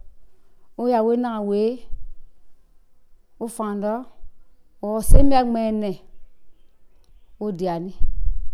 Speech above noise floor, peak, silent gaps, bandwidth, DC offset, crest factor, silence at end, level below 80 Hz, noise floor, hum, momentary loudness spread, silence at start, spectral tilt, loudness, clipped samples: 32 dB; 0 dBFS; none; 13.5 kHz; under 0.1%; 20 dB; 0 s; -26 dBFS; -49 dBFS; none; 17 LU; 0.05 s; -7 dB/octave; -23 LUFS; under 0.1%